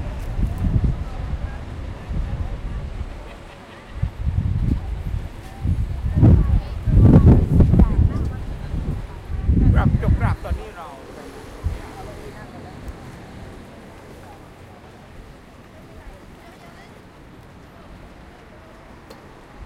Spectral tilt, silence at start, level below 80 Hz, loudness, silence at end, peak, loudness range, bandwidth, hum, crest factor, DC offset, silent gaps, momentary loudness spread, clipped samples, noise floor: -9 dB/octave; 0 s; -26 dBFS; -21 LUFS; 0 s; 0 dBFS; 24 LU; 11 kHz; none; 20 dB; under 0.1%; none; 27 LU; under 0.1%; -43 dBFS